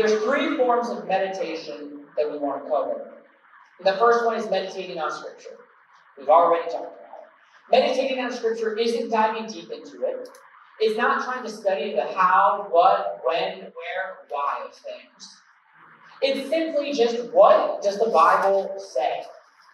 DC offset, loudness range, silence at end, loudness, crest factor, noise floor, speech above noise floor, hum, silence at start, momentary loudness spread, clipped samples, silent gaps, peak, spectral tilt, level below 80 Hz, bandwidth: under 0.1%; 7 LU; 0.4 s; -23 LUFS; 20 dB; -55 dBFS; 33 dB; none; 0 s; 18 LU; under 0.1%; none; -4 dBFS; -4 dB/octave; under -90 dBFS; 12 kHz